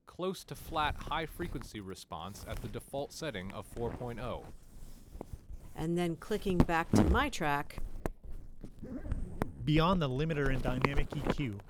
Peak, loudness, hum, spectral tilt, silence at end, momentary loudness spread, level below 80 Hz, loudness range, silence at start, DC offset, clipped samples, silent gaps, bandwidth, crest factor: -8 dBFS; -35 LUFS; none; -6 dB/octave; 0 s; 20 LU; -42 dBFS; 9 LU; 0.05 s; under 0.1%; under 0.1%; none; 17.5 kHz; 26 dB